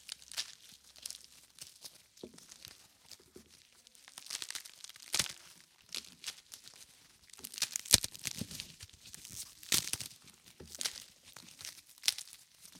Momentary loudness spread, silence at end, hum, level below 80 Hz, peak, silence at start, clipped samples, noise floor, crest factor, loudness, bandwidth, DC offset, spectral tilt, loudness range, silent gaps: 23 LU; 0 s; none; -66 dBFS; -2 dBFS; 0 s; under 0.1%; -63 dBFS; 40 dB; -36 LUFS; 17 kHz; under 0.1%; 0 dB/octave; 15 LU; none